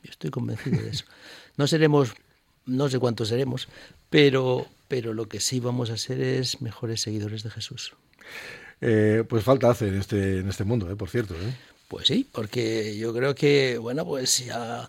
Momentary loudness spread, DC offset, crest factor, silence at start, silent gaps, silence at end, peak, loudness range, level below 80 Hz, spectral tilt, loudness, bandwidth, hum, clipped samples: 14 LU; under 0.1%; 20 dB; 0.05 s; none; 0 s; -6 dBFS; 4 LU; -56 dBFS; -5 dB/octave; -25 LUFS; 16.5 kHz; none; under 0.1%